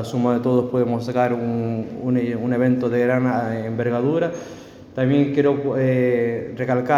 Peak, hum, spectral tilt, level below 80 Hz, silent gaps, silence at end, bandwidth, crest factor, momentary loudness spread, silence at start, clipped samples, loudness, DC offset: -4 dBFS; none; -8.5 dB/octave; -58 dBFS; none; 0 s; 7.4 kHz; 16 dB; 7 LU; 0 s; under 0.1%; -21 LUFS; under 0.1%